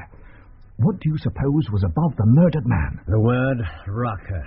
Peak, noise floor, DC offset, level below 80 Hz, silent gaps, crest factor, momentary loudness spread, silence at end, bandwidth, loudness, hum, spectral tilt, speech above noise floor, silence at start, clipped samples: -6 dBFS; -44 dBFS; under 0.1%; -36 dBFS; none; 14 dB; 10 LU; 0 s; 5.4 kHz; -21 LUFS; none; -9 dB/octave; 25 dB; 0 s; under 0.1%